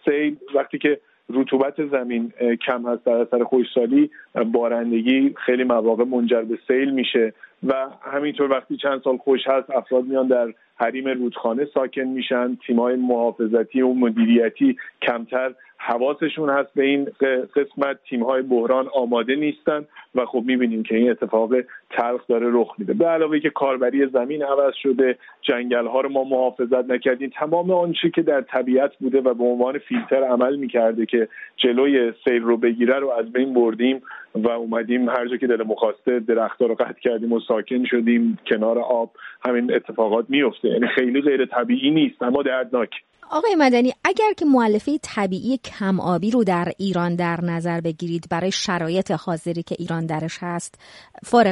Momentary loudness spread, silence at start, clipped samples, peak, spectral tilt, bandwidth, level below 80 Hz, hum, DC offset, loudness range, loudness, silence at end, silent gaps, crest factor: 6 LU; 0.05 s; under 0.1%; -4 dBFS; -6 dB/octave; 11 kHz; -66 dBFS; none; under 0.1%; 2 LU; -21 LUFS; 0 s; none; 16 dB